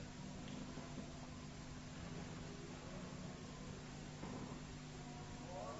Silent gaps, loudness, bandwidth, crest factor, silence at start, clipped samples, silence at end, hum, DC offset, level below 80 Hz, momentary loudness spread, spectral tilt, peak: none; -52 LUFS; 7.6 kHz; 14 dB; 0 s; under 0.1%; 0 s; none; under 0.1%; -60 dBFS; 2 LU; -5 dB/octave; -36 dBFS